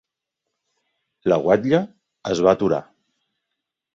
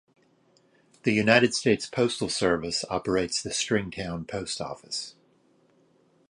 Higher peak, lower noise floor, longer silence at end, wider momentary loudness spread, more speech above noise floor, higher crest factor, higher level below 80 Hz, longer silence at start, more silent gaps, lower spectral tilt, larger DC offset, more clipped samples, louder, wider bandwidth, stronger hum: about the same, -2 dBFS vs -4 dBFS; first, -82 dBFS vs -64 dBFS; about the same, 1.15 s vs 1.2 s; about the same, 11 LU vs 13 LU; first, 63 dB vs 37 dB; about the same, 20 dB vs 24 dB; about the same, -58 dBFS vs -56 dBFS; first, 1.25 s vs 1.05 s; neither; first, -6.5 dB/octave vs -4 dB/octave; neither; neither; first, -20 LUFS vs -26 LUFS; second, 7.8 kHz vs 11.5 kHz; neither